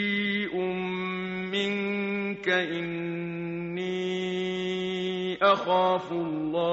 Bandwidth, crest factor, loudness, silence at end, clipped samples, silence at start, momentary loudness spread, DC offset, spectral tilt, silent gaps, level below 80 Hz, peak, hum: 8 kHz; 18 dB; -28 LUFS; 0 s; under 0.1%; 0 s; 9 LU; under 0.1%; -3.5 dB/octave; none; -66 dBFS; -10 dBFS; none